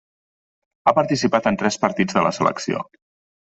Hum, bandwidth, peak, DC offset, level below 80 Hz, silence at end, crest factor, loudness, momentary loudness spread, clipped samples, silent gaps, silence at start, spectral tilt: none; 8.2 kHz; -2 dBFS; under 0.1%; -58 dBFS; 0.6 s; 20 dB; -20 LUFS; 8 LU; under 0.1%; none; 0.85 s; -5 dB/octave